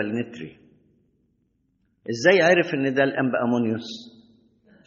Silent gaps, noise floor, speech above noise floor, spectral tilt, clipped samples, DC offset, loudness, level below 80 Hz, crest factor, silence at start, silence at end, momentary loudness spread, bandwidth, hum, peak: none; -69 dBFS; 47 dB; -4 dB/octave; under 0.1%; under 0.1%; -21 LUFS; -68 dBFS; 22 dB; 0 s; 0.75 s; 22 LU; 7.2 kHz; none; -4 dBFS